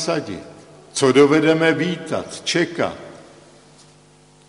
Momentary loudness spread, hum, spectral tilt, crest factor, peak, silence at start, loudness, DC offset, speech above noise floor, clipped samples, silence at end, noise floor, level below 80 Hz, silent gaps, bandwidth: 19 LU; none; -4.5 dB/octave; 18 dB; -2 dBFS; 0 s; -18 LUFS; under 0.1%; 33 dB; under 0.1%; 1.25 s; -50 dBFS; -60 dBFS; none; 11 kHz